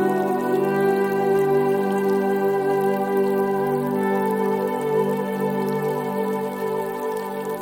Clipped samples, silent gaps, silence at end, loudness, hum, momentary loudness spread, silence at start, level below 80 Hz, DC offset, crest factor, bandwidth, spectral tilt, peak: under 0.1%; none; 0 s; -22 LUFS; none; 6 LU; 0 s; -66 dBFS; under 0.1%; 12 dB; 17 kHz; -7 dB/octave; -8 dBFS